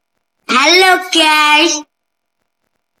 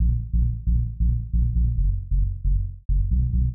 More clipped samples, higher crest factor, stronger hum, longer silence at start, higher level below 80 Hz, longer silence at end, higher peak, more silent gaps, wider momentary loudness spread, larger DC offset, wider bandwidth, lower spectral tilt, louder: first, 0.5% vs under 0.1%; first, 14 dB vs 8 dB; neither; first, 0.5 s vs 0 s; second, -62 dBFS vs -22 dBFS; first, 1.2 s vs 0 s; first, 0 dBFS vs -12 dBFS; second, none vs 2.85-2.89 s; first, 7 LU vs 4 LU; neither; first, over 20 kHz vs 0.5 kHz; second, 0.5 dB/octave vs -14 dB/octave; first, -9 LUFS vs -25 LUFS